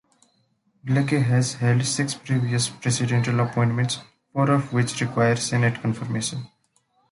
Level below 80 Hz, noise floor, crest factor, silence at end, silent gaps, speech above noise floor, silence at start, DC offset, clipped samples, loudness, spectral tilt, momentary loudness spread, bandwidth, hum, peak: -58 dBFS; -66 dBFS; 16 dB; 0.65 s; none; 44 dB; 0.85 s; under 0.1%; under 0.1%; -23 LUFS; -5 dB/octave; 6 LU; 11.5 kHz; none; -8 dBFS